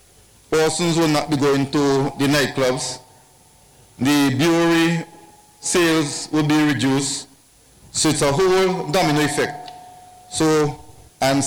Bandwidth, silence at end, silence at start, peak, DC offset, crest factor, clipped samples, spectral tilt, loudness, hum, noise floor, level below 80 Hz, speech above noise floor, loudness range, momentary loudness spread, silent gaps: 18 kHz; 0 s; 0.5 s; -8 dBFS; under 0.1%; 12 dB; under 0.1%; -4.5 dB/octave; -19 LUFS; none; -52 dBFS; -50 dBFS; 34 dB; 2 LU; 10 LU; none